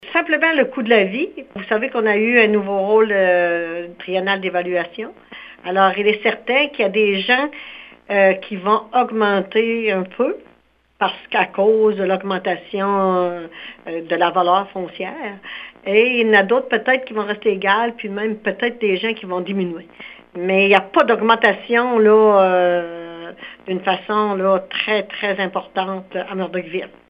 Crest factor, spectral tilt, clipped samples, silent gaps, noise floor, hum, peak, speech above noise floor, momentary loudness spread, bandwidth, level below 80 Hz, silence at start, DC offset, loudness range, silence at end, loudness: 18 dB; -7.5 dB/octave; under 0.1%; none; -57 dBFS; none; 0 dBFS; 39 dB; 16 LU; 5.2 kHz; -64 dBFS; 0.05 s; under 0.1%; 5 LU; 0.2 s; -17 LUFS